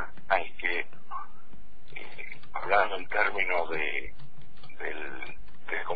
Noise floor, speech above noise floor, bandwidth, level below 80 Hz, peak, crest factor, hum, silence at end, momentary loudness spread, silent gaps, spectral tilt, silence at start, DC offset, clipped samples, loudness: -55 dBFS; 24 dB; 5 kHz; -56 dBFS; -10 dBFS; 22 dB; none; 0 s; 18 LU; none; -6.5 dB/octave; 0 s; 4%; under 0.1%; -30 LUFS